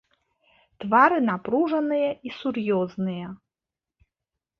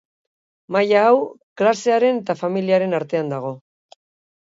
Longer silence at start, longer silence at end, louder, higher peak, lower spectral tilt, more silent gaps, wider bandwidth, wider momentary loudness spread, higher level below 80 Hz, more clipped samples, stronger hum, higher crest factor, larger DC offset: about the same, 0.8 s vs 0.7 s; first, 1.25 s vs 0.85 s; second, -23 LUFS vs -19 LUFS; about the same, -4 dBFS vs -4 dBFS; first, -8.5 dB/octave vs -6 dB/octave; second, none vs 1.43-1.56 s; second, 6.6 kHz vs 7.8 kHz; about the same, 14 LU vs 13 LU; about the same, -68 dBFS vs -72 dBFS; neither; neither; first, 22 dB vs 16 dB; neither